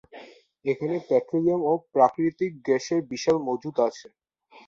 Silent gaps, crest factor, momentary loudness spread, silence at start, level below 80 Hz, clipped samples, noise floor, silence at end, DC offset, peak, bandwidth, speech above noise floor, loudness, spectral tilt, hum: none; 20 dB; 8 LU; 0.15 s; -68 dBFS; under 0.1%; -48 dBFS; 0.65 s; under 0.1%; -6 dBFS; 7.6 kHz; 24 dB; -25 LUFS; -6 dB/octave; none